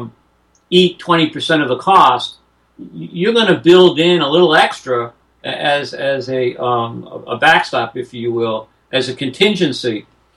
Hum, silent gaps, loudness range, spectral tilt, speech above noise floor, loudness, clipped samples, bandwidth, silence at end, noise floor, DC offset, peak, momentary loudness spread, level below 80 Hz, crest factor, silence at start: none; none; 5 LU; -5 dB/octave; 43 dB; -14 LUFS; under 0.1%; 11.5 kHz; 0.35 s; -57 dBFS; under 0.1%; 0 dBFS; 16 LU; -58 dBFS; 14 dB; 0 s